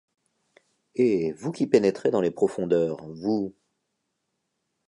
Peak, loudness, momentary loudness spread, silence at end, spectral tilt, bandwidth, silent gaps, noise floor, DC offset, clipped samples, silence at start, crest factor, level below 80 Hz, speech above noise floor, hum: -4 dBFS; -25 LUFS; 9 LU; 1.35 s; -7 dB/octave; 11 kHz; none; -79 dBFS; under 0.1%; under 0.1%; 0.95 s; 22 dB; -66 dBFS; 55 dB; none